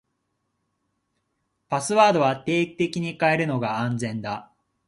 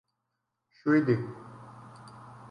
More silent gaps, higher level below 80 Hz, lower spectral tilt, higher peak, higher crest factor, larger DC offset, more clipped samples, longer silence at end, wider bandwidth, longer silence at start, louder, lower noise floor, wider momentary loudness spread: neither; first, -64 dBFS vs -72 dBFS; second, -5.5 dB/octave vs -9 dB/octave; first, -4 dBFS vs -12 dBFS; about the same, 22 dB vs 20 dB; neither; neither; first, 0.45 s vs 0.05 s; about the same, 11.5 kHz vs 10.5 kHz; first, 1.7 s vs 0.85 s; first, -23 LUFS vs -27 LUFS; second, -76 dBFS vs -83 dBFS; second, 11 LU vs 24 LU